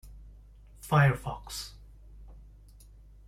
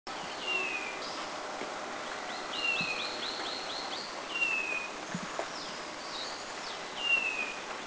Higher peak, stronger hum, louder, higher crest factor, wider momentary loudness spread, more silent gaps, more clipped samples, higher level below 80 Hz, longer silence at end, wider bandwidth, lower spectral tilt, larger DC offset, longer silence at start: first, -12 dBFS vs -20 dBFS; first, 50 Hz at -50 dBFS vs none; first, -28 LUFS vs -34 LUFS; first, 22 dB vs 16 dB; first, 20 LU vs 10 LU; neither; neither; first, -50 dBFS vs -70 dBFS; first, 0.9 s vs 0 s; first, 15.5 kHz vs 8 kHz; first, -6 dB/octave vs -1.5 dB/octave; neither; about the same, 0.05 s vs 0.05 s